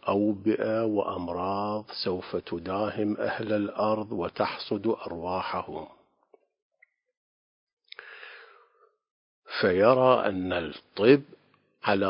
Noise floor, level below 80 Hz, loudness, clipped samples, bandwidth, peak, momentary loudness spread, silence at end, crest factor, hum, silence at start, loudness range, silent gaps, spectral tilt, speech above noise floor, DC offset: -64 dBFS; -58 dBFS; -27 LUFS; under 0.1%; 5.4 kHz; -6 dBFS; 18 LU; 0 s; 24 dB; none; 0.05 s; 13 LU; 6.62-6.70 s, 7.17-7.67 s, 7.73-7.77 s, 9.11-9.42 s; -10 dB/octave; 38 dB; under 0.1%